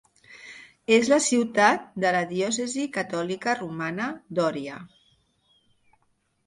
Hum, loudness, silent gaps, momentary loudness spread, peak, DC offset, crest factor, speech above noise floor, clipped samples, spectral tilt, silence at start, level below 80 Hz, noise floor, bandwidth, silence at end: none; -24 LUFS; none; 20 LU; -8 dBFS; under 0.1%; 20 dB; 46 dB; under 0.1%; -3.5 dB/octave; 0.3 s; -70 dBFS; -70 dBFS; 11.5 kHz; 1.6 s